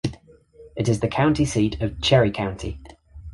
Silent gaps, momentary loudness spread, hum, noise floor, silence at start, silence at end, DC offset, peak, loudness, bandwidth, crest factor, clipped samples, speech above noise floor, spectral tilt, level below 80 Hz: none; 15 LU; none; -49 dBFS; 0.05 s; 0 s; under 0.1%; -4 dBFS; -22 LUFS; 11.5 kHz; 18 dB; under 0.1%; 28 dB; -6 dB/octave; -40 dBFS